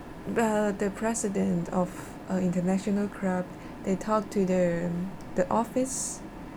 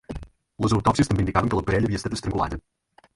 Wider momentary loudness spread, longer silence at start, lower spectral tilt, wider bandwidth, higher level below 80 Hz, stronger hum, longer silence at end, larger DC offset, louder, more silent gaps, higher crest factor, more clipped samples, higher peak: second, 7 LU vs 14 LU; about the same, 0 s vs 0.1 s; about the same, -6 dB/octave vs -6.5 dB/octave; first, 17.5 kHz vs 11.5 kHz; second, -52 dBFS vs -38 dBFS; neither; second, 0 s vs 0.55 s; neither; second, -29 LUFS vs -24 LUFS; neither; about the same, 16 dB vs 20 dB; neither; second, -12 dBFS vs -4 dBFS